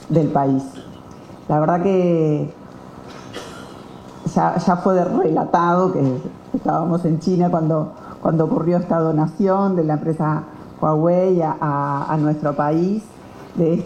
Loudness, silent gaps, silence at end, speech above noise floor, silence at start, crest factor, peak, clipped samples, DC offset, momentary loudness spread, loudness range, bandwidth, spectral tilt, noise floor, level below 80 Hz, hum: -19 LUFS; none; 0 s; 21 dB; 0 s; 18 dB; -2 dBFS; under 0.1%; under 0.1%; 20 LU; 3 LU; 9.4 kHz; -9 dB/octave; -39 dBFS; -52 dBFS; none